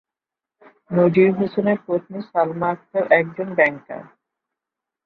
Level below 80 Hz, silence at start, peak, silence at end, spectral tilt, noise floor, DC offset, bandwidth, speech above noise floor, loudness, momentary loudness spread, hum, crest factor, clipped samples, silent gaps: -64 dBFS; 0.9 s; -2 dBFS; 1 s; -10 dB/octave; -88 dBFS; under 0.1%; 4.9 kHz; 68 dB; -20 LUFS; 9 LU; none; 20 dB; under 0.1%; none